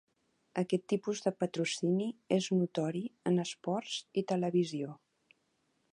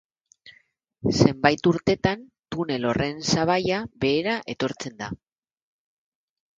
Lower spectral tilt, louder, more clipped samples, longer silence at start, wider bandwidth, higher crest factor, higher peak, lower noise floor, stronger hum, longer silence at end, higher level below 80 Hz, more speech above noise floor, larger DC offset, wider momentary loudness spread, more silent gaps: about the same, -5.5 dB/octave vs -5 dB/octave; second, -34 LUFS vs -24 LUFS; neither; about the same, 0.55 s vs 0.45 s; first, 11 kHz vs 9 kHz; second, 18 dB vs 24 dB; second, -16 dBFS vs 0 dBFS; first, -77 dBFS vs -61 dBFS; neither; second, 0.95 s vs 1.45 s; second, -82 dBFS vs -50 dBFS; first, 44 dB vs 38 dB; neither; second, 6 LU vs 14 LU; neither